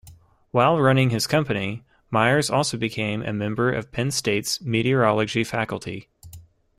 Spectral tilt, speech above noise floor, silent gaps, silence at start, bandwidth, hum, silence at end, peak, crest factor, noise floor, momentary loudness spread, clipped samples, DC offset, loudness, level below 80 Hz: -5 dB/octave; 28 dB; none; 0.05 s; 15.5 kHz; none; 0.35 s; -6 dBFS; 18 dB; -50 dBFS; 9 LU; under 0.1%; under 0.1%; -22 LUFS; -54 dBFS